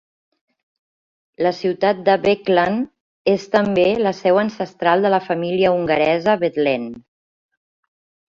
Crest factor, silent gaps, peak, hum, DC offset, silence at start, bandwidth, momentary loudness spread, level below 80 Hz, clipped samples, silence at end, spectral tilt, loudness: 18 dB; 3.01-3.25 s; -2 dBFS; none; under 0.1%; 1.4 s; 7.4 kHz; 6 LU; -58 dBFS; under 0.1%; 1.3 s; -6.5 dB/octave; -18 LUFS